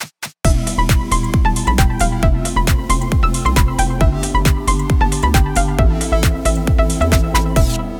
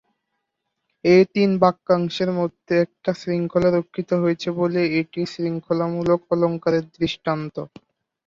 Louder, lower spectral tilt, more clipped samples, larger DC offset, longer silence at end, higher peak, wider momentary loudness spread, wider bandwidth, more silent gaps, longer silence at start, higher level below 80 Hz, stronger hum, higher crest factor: first, -16 LUFS vs -21 LUFS; second, -5 dB/octave vs -7.5 dB/octave; neither; neither; second, 0 s vs 0.6 s; about the same, 0 dBFS vs -2 dBFS; second, 2 LU vs 9 LU; first, 19.5 kHz vs 7.4 kHz; neither; second, 0 s vs 1.05 s; first, -16 dBFS vs -58 dBFS; neither; second, 14 dB vs 20 dB